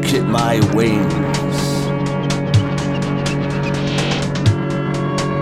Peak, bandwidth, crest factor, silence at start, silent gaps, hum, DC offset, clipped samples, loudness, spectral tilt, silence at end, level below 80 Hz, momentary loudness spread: -2 dBFS; 15 kHz; 14 dB; 0 s; none; none; under 0.1%; under 0.1%; -18 LUFS; -6 dB/octave; 0 s; -38 dBFS; 5 LU